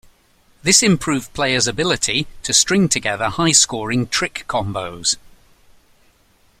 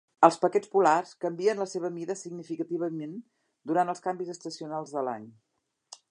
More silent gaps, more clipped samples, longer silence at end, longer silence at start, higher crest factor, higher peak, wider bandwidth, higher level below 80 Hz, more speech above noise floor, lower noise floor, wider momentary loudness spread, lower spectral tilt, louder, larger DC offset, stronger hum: neither; neither; first, 1.4 s vs 0.15 s; first, 0.65 s vs 0.2 s; second, 20 dB vs 26 dB; about the same, 0 dBFS vs -2 dBFS; first, 16.5 kHz vs 10.5 kHz; first, -46 dBFS vs -86 dBFS; first, 38 dB vs 26 dB; about the same, -56 dBFS vs -54 dBFS; second, 10 LU vs 15 LU; second, -2.5 dB/octave vs -5.5 dB/octave; first, -17 LUFS vs -29 LUFS; neither; neither